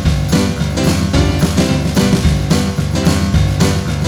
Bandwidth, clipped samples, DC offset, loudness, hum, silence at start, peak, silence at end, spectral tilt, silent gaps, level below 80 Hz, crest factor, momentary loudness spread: 20 kHz; under 0.1%; under 0.1%; -14 LUFS; none; 0 s; -2 dBFS; 0 s; -5.5 dB/octave; none; -22 dBFS; 12 dB; 2 LU